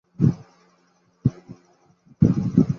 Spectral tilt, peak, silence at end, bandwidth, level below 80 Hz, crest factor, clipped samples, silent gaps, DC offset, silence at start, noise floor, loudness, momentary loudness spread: -10.5 dB/octave; -2 dBFS; 0 s; 6.8 kHz; -46 dBFS; 20 dB; under 0.1%; none; under 0.1%; 0.2 s; -62 dBFS; -22 LUFS; 7 LU